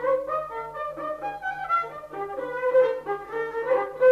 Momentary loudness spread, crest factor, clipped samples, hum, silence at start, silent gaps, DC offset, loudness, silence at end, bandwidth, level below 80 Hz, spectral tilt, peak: 12 LU; 16 dB; under 0.1%; 50 Hz at -60 dBFS; 0 s; none; under 0.1%; -27 LUFS; 0 s; 6.4 kHz; -62 dBFS; -5.5 dB/octave; -10 dBFS